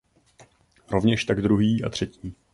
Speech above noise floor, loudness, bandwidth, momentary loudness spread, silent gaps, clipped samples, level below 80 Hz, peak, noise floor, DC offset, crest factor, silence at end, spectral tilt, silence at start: 33 dB; -24 LUFS; 11.5 kHz; 11 LU; none; under 0.1%; -48 dBFS; -6 dBFS; -56 dBFS; under 0.1%; 18 dB; 0.2 s; -6.5 dB/octave; 0.9 s